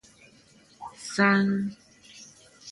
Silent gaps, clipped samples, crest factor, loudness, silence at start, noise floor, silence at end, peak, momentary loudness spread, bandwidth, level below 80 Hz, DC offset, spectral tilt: none; under 0.1%; 22 dB; -25 LUFS; 0.8 s; -57 dBFS; 0 s; -6 dBFS; 26 LU; 11.5 kHz; -68 dBFS; under 0.1%; -5.5 dB/octave